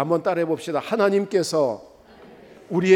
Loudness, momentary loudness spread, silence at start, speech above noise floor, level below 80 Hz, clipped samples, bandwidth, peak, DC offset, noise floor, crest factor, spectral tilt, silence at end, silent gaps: -23 LUFS; 6 LU; 0 s; 27 dB; -66 dBFS; under 0.1%; 16.5 kHz; -4 dBFS; under 0.1%; -47 dBFS; 18 dB; -5.5 dB/octave; 0 s; none